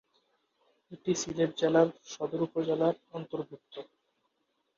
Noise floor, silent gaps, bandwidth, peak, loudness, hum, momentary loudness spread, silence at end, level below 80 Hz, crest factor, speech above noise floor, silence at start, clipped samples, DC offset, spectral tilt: -78 dBFS; none; 7.8 kHz; -10 dBFS; -31 LUFS; none; 17 LU; 0.95 s; -72 dBFS; 22 dB; 48 dB; 0.9 s; under 0.1%; under 0.1%; -5 dB/octave